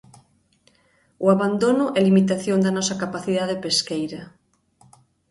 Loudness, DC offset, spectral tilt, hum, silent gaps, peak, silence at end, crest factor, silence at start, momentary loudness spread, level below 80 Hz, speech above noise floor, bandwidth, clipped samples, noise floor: -21 LUFS; under 0.1%; -5 dB/octave; none; none; -4 dBFS; 1 s; 18 dB; 1.2 s; 10 LU; -62 dBFS; 41 dB; 11.5 kHz; under 0.1%; -62 dBFS